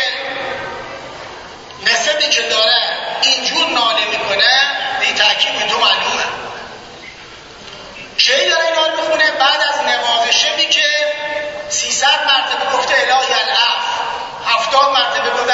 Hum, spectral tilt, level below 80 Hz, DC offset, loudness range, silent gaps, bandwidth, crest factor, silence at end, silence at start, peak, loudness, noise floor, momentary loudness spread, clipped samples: none; 0.5 dB/octave; -54 dBFS; under 0.1%; 4 LU; none; 8 kHz; 16 dB; 0 s; 0 s; 0 dBFS; -13 LUFS; -35 dBFS; 19 LU; under 0.1%